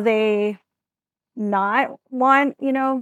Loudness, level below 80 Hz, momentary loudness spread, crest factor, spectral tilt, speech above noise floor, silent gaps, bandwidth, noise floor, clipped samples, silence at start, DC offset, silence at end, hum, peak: -20 LUFS; -82 dBFS; 10 LU; 18 dB; -6.5 dB/octave; over 70 dB; none; 8.2 kHz; under -90 dBFS; under 0.1%; 0 s; under 0.1%; 0 s; none; -4 dBFS